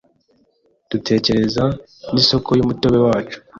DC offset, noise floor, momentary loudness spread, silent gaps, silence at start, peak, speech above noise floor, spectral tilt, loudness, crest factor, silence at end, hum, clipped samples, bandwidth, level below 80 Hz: under 0.1%; -60 dBFS; 9 LU; none; 0.9 s; -2 dBFS; 44 dB; -6 dB/octave; -17 LUFS; 16 dB; 0 s; none; under 0.1%; 7.6 kHz; -44 dBFS